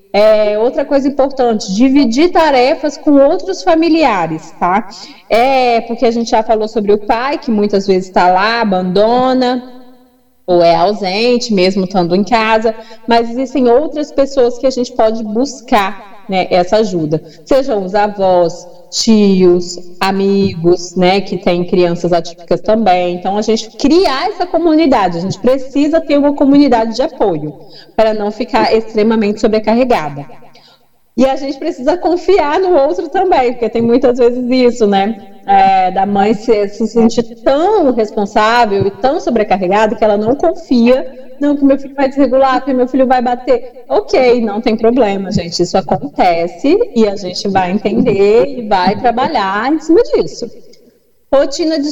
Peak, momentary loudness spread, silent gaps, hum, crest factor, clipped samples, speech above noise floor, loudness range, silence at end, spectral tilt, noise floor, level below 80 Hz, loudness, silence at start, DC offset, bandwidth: 0 dBFS; 7 LU; none; none; 12 dB; under 0.1%; 38 dB; 2 LU; 0 s; -5.5 dB/octave; -49 dBFS; -38 dBFS; -12 LUFS; 0.15 s; under 0.1%; 11.5 kHz